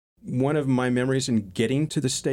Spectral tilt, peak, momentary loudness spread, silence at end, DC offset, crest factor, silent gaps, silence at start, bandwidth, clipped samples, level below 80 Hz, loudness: -5.5 dB/octave; -10 dBFS; 3 LU; 0 s; under 0.1%; 14 dB; none; 0.25 s; 15.5 kHz; under 0.1%; -58 dBFS; -24 LUFS